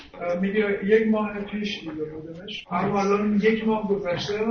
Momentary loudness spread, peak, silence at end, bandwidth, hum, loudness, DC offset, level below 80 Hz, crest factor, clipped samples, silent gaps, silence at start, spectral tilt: 13 LU; -8 dBFS; 0 s; 6.6 kHz; none; -24 LUFS; under 0.1%; -54 dBFS; 18 dB; under 0.1%; none; 0 s; -6.5 dB/octave